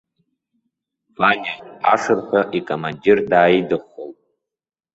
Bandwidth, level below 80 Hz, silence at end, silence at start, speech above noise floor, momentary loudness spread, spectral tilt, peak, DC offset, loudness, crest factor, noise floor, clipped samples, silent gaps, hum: 8 kHz; -60 dBFS; 0.85 s; 1.2 s; 60 dB; 14 LU; -5.5 dB/octave; -2 dBFS; under 0.1%; -18 LUFS; 18 dB; -78 dBFS; under 0.1%; none; none